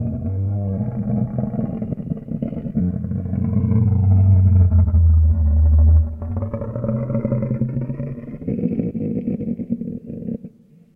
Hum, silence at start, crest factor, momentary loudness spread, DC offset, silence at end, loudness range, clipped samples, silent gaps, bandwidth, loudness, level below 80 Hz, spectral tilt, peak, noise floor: none; 0 s; 14 dB; 13 LU; under 0.1%; 0.45 s; 8 LU; under 0.1%; none; 2.5 kHz; -20 LUFS; -24 dBFS; -14 dB/octave; -4 dBFS; -44 dBFS